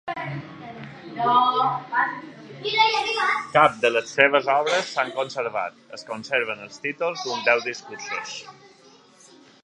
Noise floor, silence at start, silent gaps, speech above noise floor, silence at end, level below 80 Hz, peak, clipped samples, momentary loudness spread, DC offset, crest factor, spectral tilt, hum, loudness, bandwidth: -52 dBFS; 0.05 s; none; 29 dB; 1.1 s; -70 dBFS; -2 dBFS; under 0.1%; 18 LU; under 0.1%; 24 dB; -3 dB/octave; none; -22 LUFS; 11 kHz